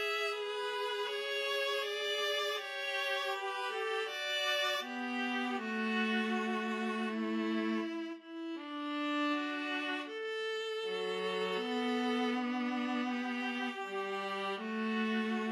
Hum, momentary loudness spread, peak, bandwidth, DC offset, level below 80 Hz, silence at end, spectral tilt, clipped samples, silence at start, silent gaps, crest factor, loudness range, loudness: none; 5 LU; -22 dBFS; 15.5 kHz; under 0.1%; under -90 dBFS; 0 s; -3.5 dB/octave; under 0.1%; 0 s; none; 14 dB; 2 LU; -35 LUFS